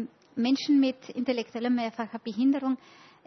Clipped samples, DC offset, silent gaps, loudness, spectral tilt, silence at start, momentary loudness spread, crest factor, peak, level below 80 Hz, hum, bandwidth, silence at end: under 0.1%; under 0.1%; none; -28 LUFS; -5 dB/octave; 0 s; 11 LU; 14 dB; -14 dBFS; -78 dBFS; none; 6.4 kHz; 0.5 s